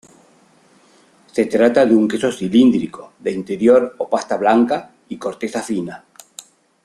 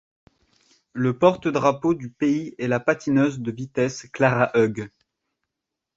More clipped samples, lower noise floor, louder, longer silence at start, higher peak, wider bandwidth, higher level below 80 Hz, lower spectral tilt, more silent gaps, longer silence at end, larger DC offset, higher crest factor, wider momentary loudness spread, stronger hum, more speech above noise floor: neither; second, -53 dBFS vs -84 dBFS; first, -17 LUFS vs -22 LUFS; first, 1.35 s vs 0.95 s; about the same, -2 dBFS vs -2 dBFS; first, 12 kHz vs 7.8 kHz; about the same, -58 dBFS vs -60 dBFS; about the same, -6 dB/octave vs -6.5 dB/octave; neither; second, 0.9 s vs 1.1 s; neither; about the same, 16 dB vs 20 dB; first, 20 LU vs 9 LU; neither; second, 36 dB vs 62 dB